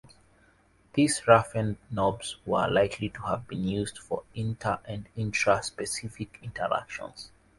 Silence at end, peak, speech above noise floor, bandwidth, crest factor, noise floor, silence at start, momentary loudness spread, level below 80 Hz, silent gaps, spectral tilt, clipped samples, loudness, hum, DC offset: 0.3 s; -4 dBFS; 34 dB; 11.5 kHz; 24 dB; -63 dBFS; 0.95 s; 16 LU; -54 dBFS; none; -5 dB/octave; under 0.1%; -28 LUFS; none; under 0.1%